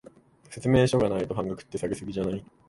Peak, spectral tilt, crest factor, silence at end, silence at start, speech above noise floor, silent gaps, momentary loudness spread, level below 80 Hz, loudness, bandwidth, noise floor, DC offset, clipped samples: -8 dBFS; -6.5 dB/octave; 20 dB; 0.3 s; 0.5 s; 27 dB; none; 11 LU; -50 dBFS; -27 LUFS; 11.5 kHz; -53 dBFS; under 0.1%; under 0.1%